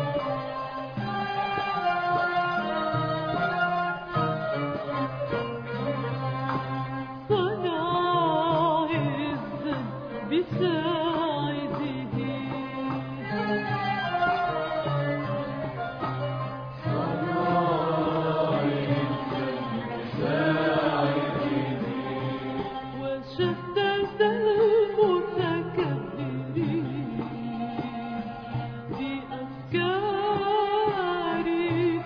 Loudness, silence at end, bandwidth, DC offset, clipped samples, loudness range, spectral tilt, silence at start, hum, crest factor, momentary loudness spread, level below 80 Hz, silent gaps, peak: -28 LUFS; 0 s; 5.4 kHz; under 0.1%; under 0.1%; 4 LU; -8.5 dB/octave; 0 s; none; 16 dB; 9 LU; -56 dBFS; none; -10 dBFS